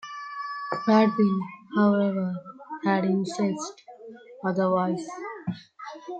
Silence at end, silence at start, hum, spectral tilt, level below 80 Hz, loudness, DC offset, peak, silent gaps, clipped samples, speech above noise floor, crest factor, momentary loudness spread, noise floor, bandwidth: 0 s; 0.05 s; none; -7 dB/octave; -72 dBFS; -26 LUFS; under 0.1%; -6 dBFS; none; under 0.1%; 21 dB; 20 dB; 19 LU; -45 dBFS; 8.8 kHz